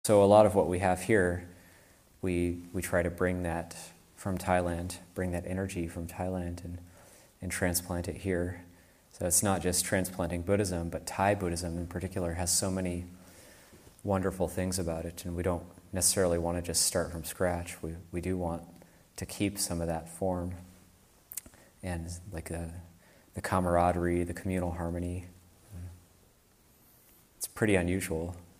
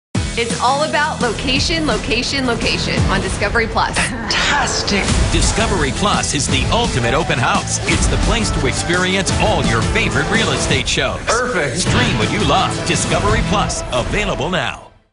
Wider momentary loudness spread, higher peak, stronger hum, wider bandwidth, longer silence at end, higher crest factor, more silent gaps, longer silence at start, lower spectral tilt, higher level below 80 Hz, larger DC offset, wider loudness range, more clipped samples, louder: first, 16 LU vs 3 LU; second, -8 dBFS vs -2 dBFS; neither; first, 15.5 kHz vs 11 kHz; about the same, 0.15 s vs 0.25 s; first, 24 dB vs 14 dB; neither; about the same, 0.05 s vs 0.15 s; about the same, -4.5 dB/octave vs -3.5 dB/octave; second, -52 dBFS vs -26 dBFS; neither; first, 6 LU vs 1 LU; neither; second, -31 LUFS vs -16 LUFS